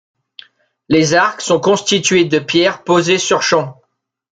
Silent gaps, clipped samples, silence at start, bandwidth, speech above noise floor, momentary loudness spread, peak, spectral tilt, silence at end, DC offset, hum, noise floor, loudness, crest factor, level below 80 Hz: none; under 0.1%; 0.9 s; 9.4 kHz; 29 dB; 3 LU; 0 dBFS; -3.5 dB/octave; 0.6 s; under 0.1%; none; -43 dBFS; -13 LUFS; 14 dB; -54 dBFS